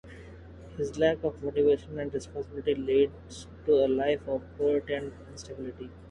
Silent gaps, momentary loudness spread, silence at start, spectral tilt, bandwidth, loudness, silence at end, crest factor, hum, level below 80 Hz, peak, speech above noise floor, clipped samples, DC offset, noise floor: none; 19 LU; 0.05 s; -6 dB/octave; 10.5 kHz; -29 LUFS; 0 s; 16 dB; none; -52 dBFS; -12 dBFS; 18 dB; under 0.1%; under 0.1%; -47 dBFS